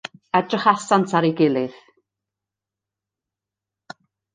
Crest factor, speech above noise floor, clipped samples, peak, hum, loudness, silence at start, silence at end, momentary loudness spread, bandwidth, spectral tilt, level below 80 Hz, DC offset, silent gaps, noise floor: 22 dB; 68 dB; under 0.1%; -2 dBFS; none; -20 LUFS; 0.35 s; 2.65 s; 6 LU; 9.6 kHz; -5.5 dB/octave; -68 dBFS; under 0.1%; none; -87 dBFS